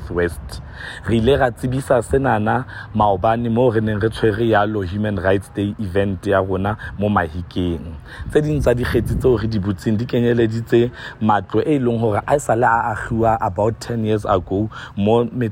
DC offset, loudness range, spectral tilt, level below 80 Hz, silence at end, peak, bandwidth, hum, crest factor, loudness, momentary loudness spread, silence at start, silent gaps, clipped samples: under 0.1%; 2 LU; -7 dB/octave; -36 dBFS; 0 s; -4 dBFS; 16 kHz; none; 14 dB; -19 LUFS; 7 LU; 0 s; none; under 0.1%